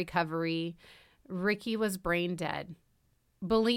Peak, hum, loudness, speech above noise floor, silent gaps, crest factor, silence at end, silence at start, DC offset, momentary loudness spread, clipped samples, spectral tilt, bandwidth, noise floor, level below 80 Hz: -14 dBFS; none; -33 LUFS; 39 dB; none; 20 dB; 0 s; 0 s; under 0.1%; 12 LU; under 0.1%; -5.5 dB/octave; 16.5 kHz; -71 dBFS; -58 dBFS